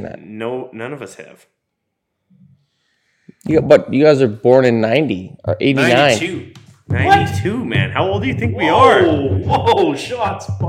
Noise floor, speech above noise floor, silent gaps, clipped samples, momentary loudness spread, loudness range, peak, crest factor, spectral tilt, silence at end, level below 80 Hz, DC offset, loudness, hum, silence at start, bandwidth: -74 dBFS; 60 dB; none; 0.2%; 16 LU; 9 LU; 0 dBFS; 16 dB; -6 dB/octave; 0 s; -44 dBFS; under 0.1%; -14 LUFS; none; 0 s; 15.5 kHz